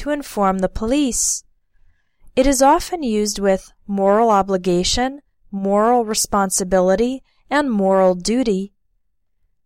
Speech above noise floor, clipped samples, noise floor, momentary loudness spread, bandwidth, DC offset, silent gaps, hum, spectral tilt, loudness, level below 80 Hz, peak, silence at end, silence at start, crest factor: 52 dB; under 0.1%; -69 dBFS; 9 LU; 16.5 kHz; under 0.1%; none; none; -4 dB/octave; -18 LUFS; -38 dBFS; -4 dBFS; 1 s; 0 s; 16 dB